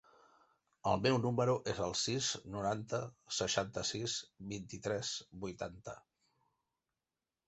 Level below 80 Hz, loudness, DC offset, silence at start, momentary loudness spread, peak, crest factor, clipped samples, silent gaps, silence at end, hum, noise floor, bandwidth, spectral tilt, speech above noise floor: -64 dBFS; -37 LUFS; under 0.1%; 0.85 s; 13 LU; -18 dBFS; 22 dB; under 0.1%; none; 1.5 s; none; under -90 dBFS; 8.2 kHz; -4 dB/octave; over 53 dB